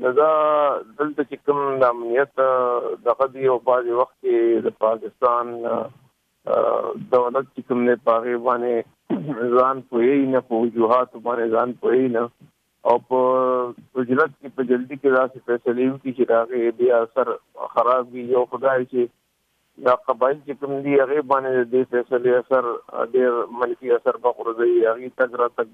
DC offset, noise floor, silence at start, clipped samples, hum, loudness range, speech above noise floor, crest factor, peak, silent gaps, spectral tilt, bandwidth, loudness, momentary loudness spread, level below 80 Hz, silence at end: under 0.1%; -68 dBFS; 0 s; under 0.1%; none; 2 LU; 48 dB; 16 dB; -4 dBFS; none; -8.5 dB/octave; 4.4 kHz; -21 LUFS; 7 LU; -70 dBFS; 0.1 s